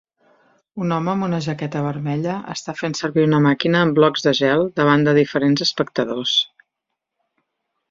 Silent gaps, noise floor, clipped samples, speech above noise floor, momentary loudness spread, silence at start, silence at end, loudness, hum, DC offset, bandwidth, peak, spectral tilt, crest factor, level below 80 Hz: none; -80 dBFS; under 0.1%; 62 dB; 10 LU; 0.75 s; 1.45 s; -19 LUFS; none; under 0.1%; 7.8 kHz; -2 dBFS; -5.5 dB/octave; 18 dB; -60 dBFS